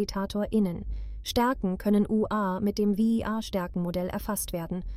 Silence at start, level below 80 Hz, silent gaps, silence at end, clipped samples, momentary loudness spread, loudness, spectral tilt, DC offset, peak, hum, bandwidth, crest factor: 0 s; -42 dBFS; none; 0 s; under 0.1%; 7 LU; -28 LUFS; -6 dB/octave; under 0.1%; -14 dBFS; none; 16 kHz; 14 dB